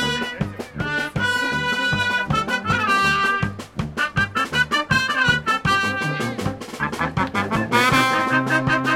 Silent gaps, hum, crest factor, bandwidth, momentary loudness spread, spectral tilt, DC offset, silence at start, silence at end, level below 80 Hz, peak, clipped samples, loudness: none; none; 18 dB; 16.5 kHz; 9 LU; -4 dB/octave; under 0.1%; 0 s; 0 s; -44 dBFS; -2 dBFS; under 0.1%; -20 LUFS